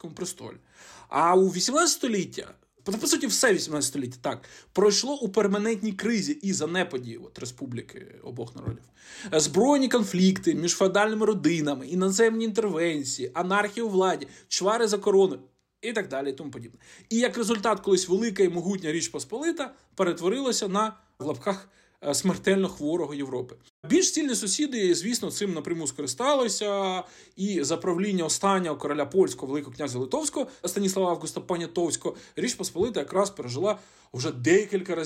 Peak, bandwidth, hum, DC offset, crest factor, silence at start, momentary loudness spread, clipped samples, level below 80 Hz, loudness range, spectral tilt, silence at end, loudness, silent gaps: -10 dBFS; 15.5 kHz; none; under 0.1%; 16 dB; 0.05 s; 14 LU; under 0.1%; -64 dBFS; 5 LU; -4 dB/octave; 0 s; -26 LUFS; 23.70-23.83 s